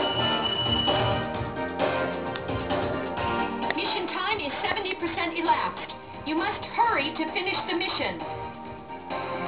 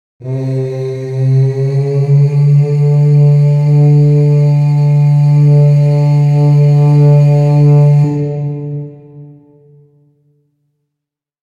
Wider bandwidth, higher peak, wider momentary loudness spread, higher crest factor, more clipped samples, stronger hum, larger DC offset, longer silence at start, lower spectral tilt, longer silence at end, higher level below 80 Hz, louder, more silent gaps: second, 4 kHz vs 4.9 kHz; second, -8 dBFS vs -2 dBFS; about the same, 11 LU vs 11 LU; first, 20 dB vs 8 dB; neither; neither; first, 0.2% vs under 0.1%; second, 0 s vs 0.2 s; second, -2 dB/octave vs -10.5 dB/octave; second, 0 s vs 2.25 s; first, -48 dBFS vs -60 dBFS; second, -27 LUFS vs -10 LUFS; neither